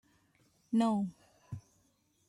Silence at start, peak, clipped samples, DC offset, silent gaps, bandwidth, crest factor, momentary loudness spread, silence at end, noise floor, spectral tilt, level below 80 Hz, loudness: 0.7 s; -20 dBFS; under 0.1%; under 0.1%; none; 11 kHz; 18 dB; 19 LU; 0.7 s; -73 dBFS; -7 dB/octave; -74 dBFS; -33 LUFS